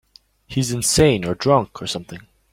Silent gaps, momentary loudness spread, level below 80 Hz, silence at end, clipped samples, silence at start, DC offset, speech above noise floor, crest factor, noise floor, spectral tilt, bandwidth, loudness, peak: none; 15 LU; -42 dBFS; 0.3 s; under 0.1%; 0.5 s; under 0.1%; 26 dB; 18 dB; -45 dBFS; -4.5 dB/octave; 16.5 kHz; -19 LUFS; -2 dBFS